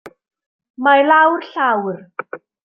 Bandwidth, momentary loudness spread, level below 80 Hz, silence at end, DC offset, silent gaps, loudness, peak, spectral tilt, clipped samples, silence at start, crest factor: 5.8 kHz; 19 LU; -72 dBFS; 0.25 s; under 0.1%; 0.46-0.59 s, 0.70-0.74 s; -15 LUFS; -2 dBFS; -6.5 dB/octave; under 0.1%; 0.05 s; 16 dB